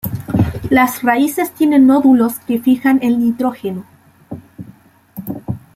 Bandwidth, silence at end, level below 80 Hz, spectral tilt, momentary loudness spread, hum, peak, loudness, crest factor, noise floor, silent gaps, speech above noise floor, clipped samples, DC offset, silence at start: 16 kHz; 0.15 s; -44 dBFS; -6.5 dB/octave; 21 LU; none; -2 dBFS; -14 LUFS; 14 dB; -44 dBFS; none; 31 dB; under 0.1%; under 0.1%; 0.05 s